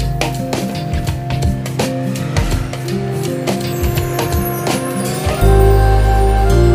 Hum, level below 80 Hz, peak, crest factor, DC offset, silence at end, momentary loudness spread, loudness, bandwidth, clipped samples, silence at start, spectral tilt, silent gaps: none; -18 dBFS; 0 dBFS; 14 dB; under 0.1%; 0 s; 8 LU; -16 LUFS; 16 kHz; under 0.1%; 0 s; -6 dB/octave; none